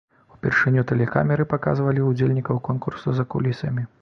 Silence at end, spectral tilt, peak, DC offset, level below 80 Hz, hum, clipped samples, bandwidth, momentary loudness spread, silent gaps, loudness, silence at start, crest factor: 0.15 s; -9 dB/octave; -2 dBFS; under 0.1%; -52 dBFS; none; under 0.1%; 6.4 kHz; 7 LU; none; -22 LUFS; 0.45 s; 20 dB